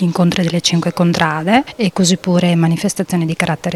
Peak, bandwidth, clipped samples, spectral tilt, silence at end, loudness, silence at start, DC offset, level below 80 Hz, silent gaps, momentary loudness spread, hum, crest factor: 0 dBFS; 13 kHz; under 0.1%; -5 dB/octave; 0 s; -15 LUFS; 0 s; under 0.1%; -50 dBFS; none; 4 LU; none; 14 dB